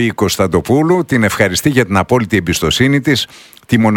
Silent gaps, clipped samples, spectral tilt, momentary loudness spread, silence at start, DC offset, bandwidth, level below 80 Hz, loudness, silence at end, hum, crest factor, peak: none; under 0.1%; -5 dB/octave; 3 LU; 0 s; under 0.1%; 19 kHz; -38 dBFS; -13 LUFS; 0 s; none; 12 dB; 0 dBFS